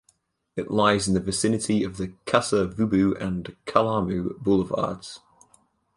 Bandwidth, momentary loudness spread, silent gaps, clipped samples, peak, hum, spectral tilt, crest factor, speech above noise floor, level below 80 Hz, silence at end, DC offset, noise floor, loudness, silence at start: 11.5 kHz; 12 LU; none; under 0.1%; -4 dBFS; none; -5 dB/octave; 22 dB; 43 dB; -50 dBFS; 0.8 s; under 0.1%; -67 dBFS; -24 LUFS; 0.55 s